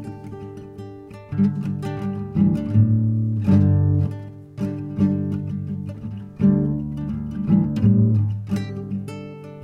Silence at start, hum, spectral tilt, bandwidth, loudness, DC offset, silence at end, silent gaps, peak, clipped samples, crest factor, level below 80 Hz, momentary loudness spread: 0 s; none; -10 dB/octave; 5.8 kHz; -21 LUFS; under 0.1%; 0 s; none; -6 dBFS; under 0.1%; 14 dB; -44 dBFS; 18 LU